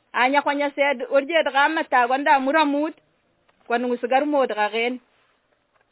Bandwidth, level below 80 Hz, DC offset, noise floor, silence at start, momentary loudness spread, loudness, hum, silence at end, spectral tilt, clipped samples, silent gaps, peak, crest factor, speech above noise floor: 4 kHz; -76 dBFS; under 0.1%; -66 dBFS; 0.15 s; 7 LU; -21 LUFS; none; 0.95 s; -6.5 dB/octave; under 0.1%; none; -4 dBFS; 18 dB; 45 dB